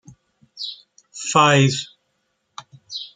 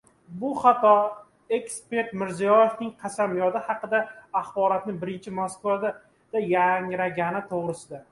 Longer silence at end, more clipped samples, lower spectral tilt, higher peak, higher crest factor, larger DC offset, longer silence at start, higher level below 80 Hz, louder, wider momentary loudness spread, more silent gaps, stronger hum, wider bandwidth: about the same, 0.1 s vs 0.1 s; neither; second, -4 dB/octave vs -5.5 dB/octave; first, -2 dBFS vs -6 dBFS; about the same, 20 dB vs 20 dB; neither; first, 0.55 s vs 0.3 s; first, -62 dBFS vs -68 dBFS; first, -19 LUFS vs -25 LUFS; first, 27 LU vs 13 LU; neither; neither; second, 9.6 kHz vs 11.5 kHz